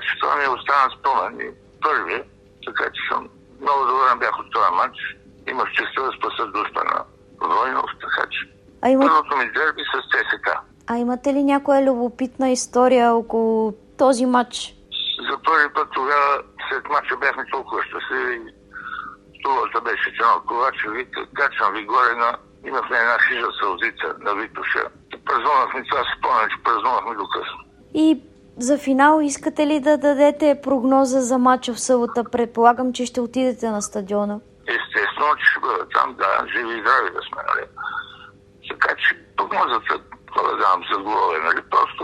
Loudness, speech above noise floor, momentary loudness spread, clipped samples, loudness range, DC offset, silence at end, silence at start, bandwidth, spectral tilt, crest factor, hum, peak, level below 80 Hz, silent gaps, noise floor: -20 LUFS; 26 dB; 11 LU; under 0.1%; 5 LU; under 0.1%; 0 s; 0 s; 12.5 kHz; -3 dB/octave; 20 dB; none; -2 dBFS; -58 dBFS; none; -46 dBFS